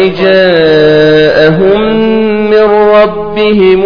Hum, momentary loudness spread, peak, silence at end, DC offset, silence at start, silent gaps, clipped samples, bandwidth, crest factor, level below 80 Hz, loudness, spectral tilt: none; 4 LU; 0 dBFS; 0 s; under 0.1%; 0 s; none; 3%; 5.4 kHz; 6 dB; -34 dBFS; -6 LUFS; -7.5 dB/octave